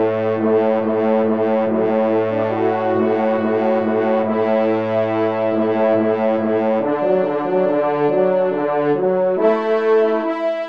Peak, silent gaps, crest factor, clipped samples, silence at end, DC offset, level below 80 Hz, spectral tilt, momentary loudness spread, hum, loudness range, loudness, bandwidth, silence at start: -4 dBFS; none; 12 dB; under 0.1%; 0 s; 0.3%; -66 dBFS; -9 dB/octave; 2 LU; none; 1 LU; -17 LUFS; 5.8 kHz; 0 s